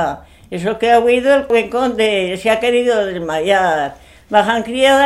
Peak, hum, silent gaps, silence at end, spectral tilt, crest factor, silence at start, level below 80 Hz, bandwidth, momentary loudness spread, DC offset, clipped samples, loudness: 0 dBFS; none; none; 0 s; -4 dB/octave; 14 dB; 0 s; -46 dBFS; 13 kHz; 9 LU; 0.1%; under 0.1%; -15 LUFS